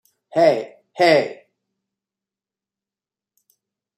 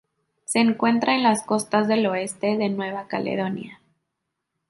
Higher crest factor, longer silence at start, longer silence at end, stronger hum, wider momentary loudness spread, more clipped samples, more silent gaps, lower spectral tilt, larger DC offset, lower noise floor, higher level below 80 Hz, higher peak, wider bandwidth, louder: about the same, 20 dB vs 18 dB; second, 0.35 s vs 0.5 s; first, 2.65 s vs 0.95 s; neither; first, 14 LU vs 9 LU; neither; neither; about the same, -5 dB/octave vs -4.5 dB/octave; neither; first, under -90 dBFS vs -80 dBFS; about the same, -74 dBFS vs -70 dBFS; about the same, -4 dBFS vs -4 dBFS; about the same, 12.5 kHz vs 11.5 kHz; first, -18 LUFS vs -22 LUFS